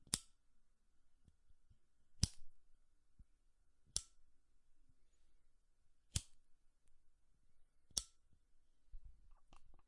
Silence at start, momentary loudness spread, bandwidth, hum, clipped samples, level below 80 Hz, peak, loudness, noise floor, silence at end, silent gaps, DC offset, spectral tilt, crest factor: 0 s; 23 LU; 11.5 kHz; none; under 0.1%; -62 dBFS; -16 dBFS; -45 LUFS; -72 dBFS; 0 s; none; under 0.1%; -2 dB/octave; 36 dB